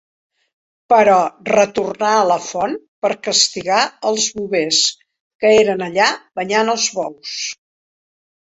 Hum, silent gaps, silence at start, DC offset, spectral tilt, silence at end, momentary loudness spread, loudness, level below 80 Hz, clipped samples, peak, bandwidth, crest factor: none; 2.88-3.02 s, 5.20-5.39 s; 0.9 s; under 0.1%; -2 dB/octave; 0.9 s; 11 LU; -16 LUFS; -60 dBFS; under 0.1%; 0 dBFS; 8.2 kHz; 16 dB